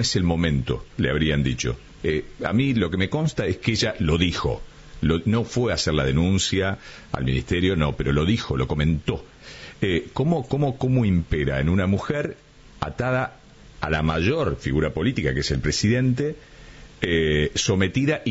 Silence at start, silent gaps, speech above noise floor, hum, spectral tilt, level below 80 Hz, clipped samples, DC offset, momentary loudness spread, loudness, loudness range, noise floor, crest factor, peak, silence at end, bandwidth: 0 s; none; 22 dB; none; -5.5 dB/octave; -36 dBFS; under 0.1%; under 0.1%; 8 LU; -23 LUFS; 2 LU; -44 dBFS; 16 dB; -6 dBFS; 0 s; 8 kHz